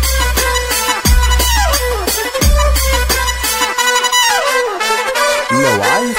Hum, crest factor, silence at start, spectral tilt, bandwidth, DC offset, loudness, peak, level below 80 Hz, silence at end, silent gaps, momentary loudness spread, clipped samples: none; 12 dB; 0 s; -2.5 dB/octave; 16.5 kHz; under 0.1%; -12 LUFS; 0 dBFS; -18 dBFS; 0 s; none; 4 LU; under 0.1%